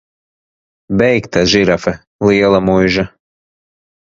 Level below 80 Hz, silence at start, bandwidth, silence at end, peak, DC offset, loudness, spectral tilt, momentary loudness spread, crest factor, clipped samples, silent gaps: -40 dBFS; 0.9 s; 7.6 kHz; 1.1 s; 0 dBFS; under 0.1%; -13 LUFS; -5.5 dB/octave; 8 LU; 14 dB; under 0.1%; 2.07-2.19 s